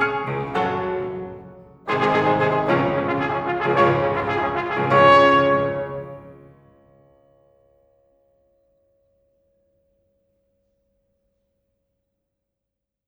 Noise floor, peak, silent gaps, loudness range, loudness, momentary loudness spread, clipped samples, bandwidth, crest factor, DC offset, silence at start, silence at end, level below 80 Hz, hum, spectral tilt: -84 dBFS; -2 dBFS; none; 6 LU; -19 LUFS; 20 LU; under 0.1%; 8.2 kHz; 20 dB; under 0.1%; 0 s; 6.75 s; -54 dBFS; none; -7 dB/octave